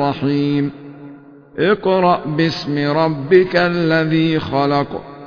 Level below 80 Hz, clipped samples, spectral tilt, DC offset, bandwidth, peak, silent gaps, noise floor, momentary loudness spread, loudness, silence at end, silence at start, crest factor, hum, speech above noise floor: -50 dBFS; under 0.1%; -7.5 dB/octave; under 0.1%; 5.4 kHz; 0 dBFS; none; -39 dBFS; 9 LU; -16 LUFS; 0 s; 0 s; 16 dB; none; 24 dB